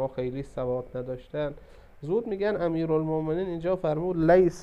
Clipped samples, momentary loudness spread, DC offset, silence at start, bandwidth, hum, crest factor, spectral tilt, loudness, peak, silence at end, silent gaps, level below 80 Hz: under 0.1%; 13 LU; under 0.1%; 0 s; 9.6 kHz; none; 18 dB; -8 dB/octave; -28 LUFS; -8 dBFS; 0 s; none; -50 dBFS